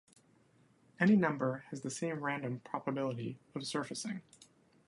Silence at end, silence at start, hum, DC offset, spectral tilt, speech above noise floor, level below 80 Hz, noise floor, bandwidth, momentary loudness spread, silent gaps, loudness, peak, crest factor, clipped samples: 0.65 s; 1 s; none; under 0.1%; -5.5 dB/octave; 33 dB; -78 dBFS; -68 dBFS; 11.5 kHz; 14 LU; none; -36 LUFS; -16 dBFS; 22 dB; under 0.1%